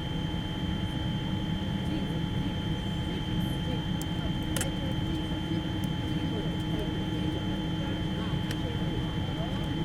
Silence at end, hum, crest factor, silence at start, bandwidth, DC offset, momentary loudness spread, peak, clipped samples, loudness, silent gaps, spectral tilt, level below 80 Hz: 0 s; none; 18 dB; 0 s; 16.5 kHz; under 0.1%; 1 LU; -12 dBFS; under 0.1%; -32 LUFS; none; -6 dB/octave; -40 dBFS